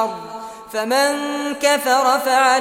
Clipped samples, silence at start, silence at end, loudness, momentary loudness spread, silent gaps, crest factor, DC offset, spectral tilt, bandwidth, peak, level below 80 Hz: under 0.1%; 0 s; 0 s; -18 LUFS; 15 LU; none; 16 dB; under 0.1%; -1.5 dB/octave; 17.5 kHz; -2 dBFS; -64 dBFS